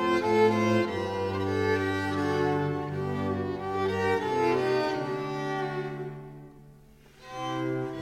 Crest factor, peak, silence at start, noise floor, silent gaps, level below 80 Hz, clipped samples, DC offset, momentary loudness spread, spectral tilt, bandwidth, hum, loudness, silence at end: 18 dB; -12 dBFS; 0 s; -54 dBFS; none; -60 dBFS; under 0.1%; under 0.1%; 12 LU; -6.5 dB/octave; 15.5 kHz; none; -28 LUFS; 0 s